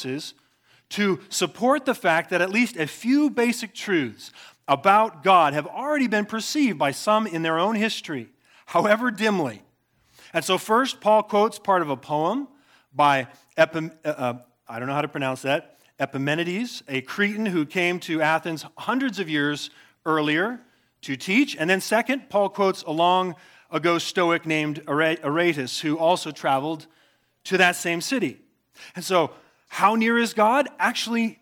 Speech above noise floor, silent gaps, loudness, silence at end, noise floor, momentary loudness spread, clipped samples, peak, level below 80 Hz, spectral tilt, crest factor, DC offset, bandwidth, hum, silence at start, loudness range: 40 dB; none; -23 LUFS; 0.1 s; -63 dBFS; 12 LU; under 0.1%; -2 dBFS; -78 dBFS; -4.5 dB/octave; 20 dB; under 0.1%; 18.5 kHz; none; 0 s; 4 LU